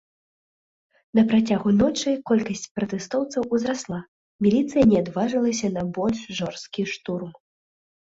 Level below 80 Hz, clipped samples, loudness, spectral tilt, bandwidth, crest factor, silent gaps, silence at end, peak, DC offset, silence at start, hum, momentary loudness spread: -54 dBFS; under 0.1%; -23 LUFS; -5.5 dB/octave; 7.8 kHz; 18 dB; 2.71-2.75 s, 4.08-4.39 s; 0.85 s; -6 dBFS; under 0.1%; 1.15 s; none; 11 LU